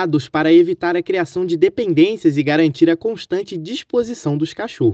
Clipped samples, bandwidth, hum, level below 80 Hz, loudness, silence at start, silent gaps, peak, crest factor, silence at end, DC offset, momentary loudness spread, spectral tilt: under 0.1%; 8 kHz; none; -60 dBFS; -17 LUFS; 0 s; none; -2 dBFS; 16 dB; 0 s; under 0.1%; 10 LU; -7 dB/octave